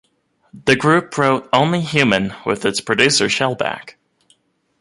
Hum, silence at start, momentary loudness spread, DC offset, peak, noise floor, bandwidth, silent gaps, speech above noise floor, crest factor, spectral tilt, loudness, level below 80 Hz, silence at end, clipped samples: none; 0.55 s; 9 LU; under 0.1%; 0 dBFS; -59 dBFS; 11.5 kHz; none; 42 dB; 18 dB; -4 dB/octave; -16 LUFS; -54 dBFS; 0.9 s; under 0.1%